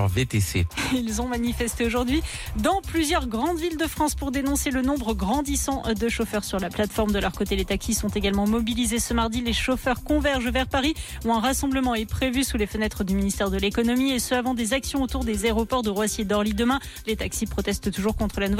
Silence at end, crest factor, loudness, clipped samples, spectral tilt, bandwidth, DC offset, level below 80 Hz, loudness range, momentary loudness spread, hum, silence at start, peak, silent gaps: 0 s; 12 dB; -25 LUFS; under 0.1%; -4.5 dB/octave; 17 kHz; under 0.1%; -34 dBFS; 1 LU; 4 LU; none; 0 s; -12 dBFS; none